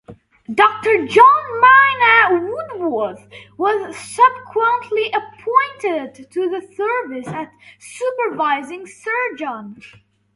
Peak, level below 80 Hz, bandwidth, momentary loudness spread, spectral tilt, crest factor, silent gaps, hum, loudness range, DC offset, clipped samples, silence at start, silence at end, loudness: 0 dBFS; -62 dBFS; 11.5 kHz; 17 LU; -4 dB/octave; 18 dB; none; none; 10 LU; under 0.1%; under 0.1%; 0.1 s; 0.5 s; -16 LUFS